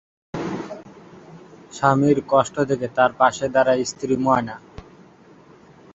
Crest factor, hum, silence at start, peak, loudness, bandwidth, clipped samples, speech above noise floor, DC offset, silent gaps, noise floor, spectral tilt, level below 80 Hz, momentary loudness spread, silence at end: 20 dB; none; 0.35 s; -2 dBFS; -20 LUFS; 8 kHz; under 0.1%; 30 dB; under 0.1%; none; -49 dBFS; -5.5 dB/octave; -56 dBFS; 18 LU; 1.15 s